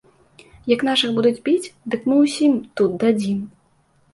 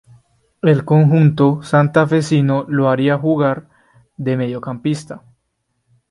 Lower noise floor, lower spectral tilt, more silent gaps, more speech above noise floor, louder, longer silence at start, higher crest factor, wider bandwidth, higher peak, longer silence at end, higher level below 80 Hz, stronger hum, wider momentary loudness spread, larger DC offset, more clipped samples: second, -60 dBFS vs -70 dBFS; second, -5 dB/octave vs -8 dB/octave; neither; second, 41 dB vs 55 dB; second, -19 LUFS vs -16 LUFS; about the same, 0.65 s vs 0.65 s; about the same, 16 dB vs 16 dB; about the same, 11.5 kHz vs 11.5 kHz; second, -4 dBFS vs 0 dBFS; second, 0.65 s vs 0.95 s; about the same, -60 dBFS vs -56 dBFS; neither; about the same, 10 LU vs 12 LU; neither; neither